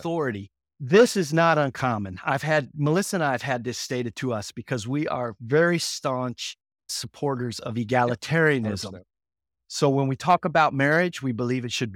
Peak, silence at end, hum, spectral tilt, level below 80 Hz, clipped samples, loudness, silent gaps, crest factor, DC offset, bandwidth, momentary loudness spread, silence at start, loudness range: -6 dBFS; 0 s; none; -5 dB/octave; -64 dBFS; under 0.1%; -24 LUFS; none; 18 dB; under 0.1%; 17 kHz; 11 LU; 0 s; 4 LU